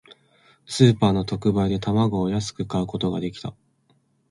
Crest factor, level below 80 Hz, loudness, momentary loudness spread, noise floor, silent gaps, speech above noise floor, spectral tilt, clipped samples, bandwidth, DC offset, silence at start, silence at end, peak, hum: 22 dB; -48 dBFS; -22 LUFS; 14 LU; -64 dBFS; none; 43 dB; -6.5 dB/octave; under 0.1%; 11.5 kHz; under 0.1%; 0.1 s; 0.8 s; -2 dBFS; none